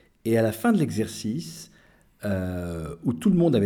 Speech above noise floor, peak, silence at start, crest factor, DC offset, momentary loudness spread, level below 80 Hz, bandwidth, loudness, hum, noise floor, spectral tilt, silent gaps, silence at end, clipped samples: 32 dB; -10 dBFS; 0.25 s; 16 dB; under 0.1%; 12 LU; -52 dBFS; 18.5 kHz; -26 LUFS; none; -56 dBFS; -7 dB/octave; none; 0 s; under 0.1%